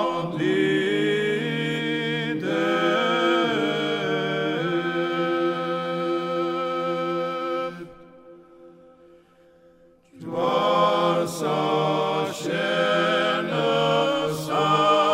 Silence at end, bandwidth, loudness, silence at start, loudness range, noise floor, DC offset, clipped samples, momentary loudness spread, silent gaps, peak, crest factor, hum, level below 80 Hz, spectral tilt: 0 s; 16 kHz; -23 LUFS; 0 s; 8 LU; -55 dBFS; under 0.1%; under 0.1%; 6 LU; none; -8 dBFS; 16 dB; none; -66 dBFS; -5 dB/octave